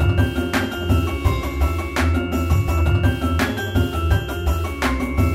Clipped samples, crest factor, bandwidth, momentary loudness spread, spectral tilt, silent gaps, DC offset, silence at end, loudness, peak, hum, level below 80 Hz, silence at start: under 0.1%; 14 dB; 16 kHz; 3 LU; -6.5 dB/octave; none; under 0.1%; 0 s; -21 LUFS; -4 dBFS; none; -24 dBFS; 0 s